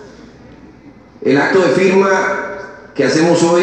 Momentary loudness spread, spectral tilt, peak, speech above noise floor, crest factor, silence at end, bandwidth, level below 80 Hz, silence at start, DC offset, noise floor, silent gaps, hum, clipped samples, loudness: 13 LU; -5 dB/octave; 0 dBFS; 29 dB; 14 dB; 0 s; 9.2 kHz; -54 dBFS; 0 s; under 0.1%; -40 dBFS; none; none; under 0.1%; -13 LUFS